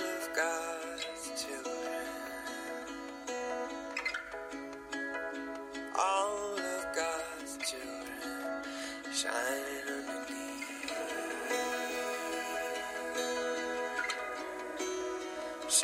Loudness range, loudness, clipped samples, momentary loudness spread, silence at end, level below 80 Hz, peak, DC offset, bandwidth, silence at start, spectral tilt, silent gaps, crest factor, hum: 4 LU; -37 LUFS; under 0.1%; 8 LU; 0 s; -68 dBFS; -12 dBFS; under 0.1%; 16 kHz; 0 s; -0.5 dB/octave; none; 26 dB; none